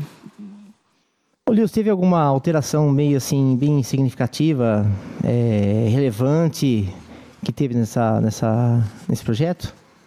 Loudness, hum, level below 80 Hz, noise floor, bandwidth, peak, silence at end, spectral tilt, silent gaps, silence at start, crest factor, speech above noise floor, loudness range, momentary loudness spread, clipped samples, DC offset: -19 LUFS; none; -52 dBFS; -67 dBFS; 15.5 kHz; -6 dBFS; 0.35 s; -7.5 dB/octave; none; 0 s; 14 dB; 49 dB; 2 LU; 9 LU; under 0.1%; under 0.1%